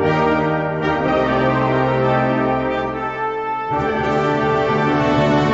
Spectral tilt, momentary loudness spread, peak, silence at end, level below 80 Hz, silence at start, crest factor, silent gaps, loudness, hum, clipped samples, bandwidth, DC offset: -7.5 dB/octave; 6 LU; -4 dBFS; 0 s; -40 dBFS; 0 s; 14 dB; none; -18 LUFS; none; under 0.1%; 7.8 kHz; under 0.1%